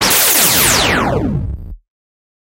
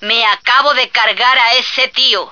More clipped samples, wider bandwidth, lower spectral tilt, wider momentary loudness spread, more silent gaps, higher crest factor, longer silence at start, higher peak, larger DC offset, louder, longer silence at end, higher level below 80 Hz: neither; first, 16.5 kHz vs 5.4 kHz; first, -2 dB/octave vs 0 dB/octave; first, 16 LU vs 2 LU; neither; about the same, 14 dB vs 12 dB; about the same, 0 s vs 0 s; about the same, 0 dBFS vs 0 dBFS; second, under 0.1% vs 0.3%; about the same, -11 LUFS vs -10 LUFS; first, 0.8 s vs 0 s; first, -30 dBFS vs -62 dBFS